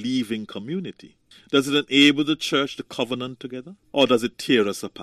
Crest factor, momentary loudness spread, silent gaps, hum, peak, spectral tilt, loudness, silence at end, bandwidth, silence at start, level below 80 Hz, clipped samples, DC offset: 20 dB; 16 LU; none; none; -4 dBFS; -4 dB/octave; -22 LUFS; 0 s; 14.5 kHz; 0 s; -66 dBFS; under 0.1%; under 0.1%